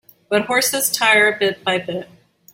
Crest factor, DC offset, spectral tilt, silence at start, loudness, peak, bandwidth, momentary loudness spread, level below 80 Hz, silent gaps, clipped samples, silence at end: 18 dB; under 0.1%; -1.5 dB/octave; 0.3 s; -16 LUFS; -2 dBFS; 16.5 kHz; 10 LU; -64 dBFS; none; under 0.1%; 0.5 s